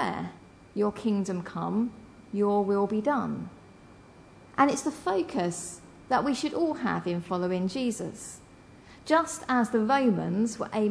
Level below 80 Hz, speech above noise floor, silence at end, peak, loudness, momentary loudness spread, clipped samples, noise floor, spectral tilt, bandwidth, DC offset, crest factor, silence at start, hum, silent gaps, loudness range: -62 dBFS; 25 dB; 0 s; -8 dBFS; -28 LUFS; 13 LU; under 0.1%; -52 dBFS; -5.5 dB/octave; 11 kHz; under 0.1%; 20 dB; 0 s; none; none; 2 LU